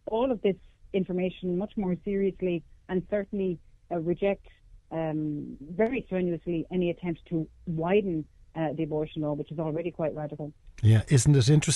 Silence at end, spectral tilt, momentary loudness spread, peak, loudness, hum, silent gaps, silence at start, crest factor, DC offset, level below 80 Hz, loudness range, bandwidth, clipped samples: 0 s; -6.5 dB/octave; 13 LU; -10 dBFS; -29 LUFS; none; none; 0.1 s; 18 dB; under 0.1%; -52 dBFS; 3 LU; 12 kHz; under 0.1%